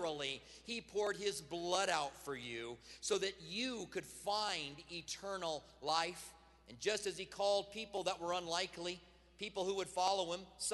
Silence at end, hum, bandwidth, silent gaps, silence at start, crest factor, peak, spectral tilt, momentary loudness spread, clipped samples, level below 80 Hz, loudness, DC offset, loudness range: 0 s; none; 12 kHz; none; 0 s; 22 dB; -18 dBFS; -2 dB/octave; 10 LU; under 0.1%; -70 dBFS; -40 LUFS; under 0.1%; 2 LU